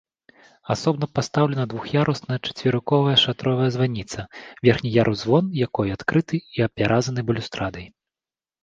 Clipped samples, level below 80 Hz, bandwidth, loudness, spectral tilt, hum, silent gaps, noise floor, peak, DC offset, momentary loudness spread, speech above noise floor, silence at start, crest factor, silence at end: under 0.1%; -50 dBFS; 7.8 kHz; -22 LUFS; -6 dB/octave; none; none; under -90 dBFS; -2 dBFS; under 0.1%; 10 LU; over 68 dB; 0.65 s; 20 dB; 0.75 s